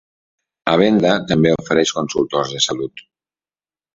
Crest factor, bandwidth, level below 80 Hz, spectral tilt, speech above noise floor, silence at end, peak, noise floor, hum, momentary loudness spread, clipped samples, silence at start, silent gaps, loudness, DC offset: 18 dB; 7.8 kHz; -50 dBFS; -4.5 dB/octave; over 74 dB; 0.95 s; 0 dBFS; under -90 dBFS; 50 Hz at -55 dBFS; 9 LU; under 0.1%; 0.65 s; none; -17 LUFS; under 0.1%